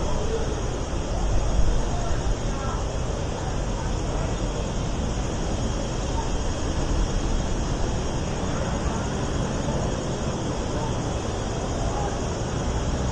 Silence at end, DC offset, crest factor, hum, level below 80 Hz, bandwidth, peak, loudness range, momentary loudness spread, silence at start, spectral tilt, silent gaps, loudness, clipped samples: 0 s; under 0.1%; 16 dB; none; -28 dBFS; 10.5 kHz; -8 dBFS; 1 LU; 2 LU; 0 s; -5.5 dB/octave; none; -28 LUFS; under 0.1%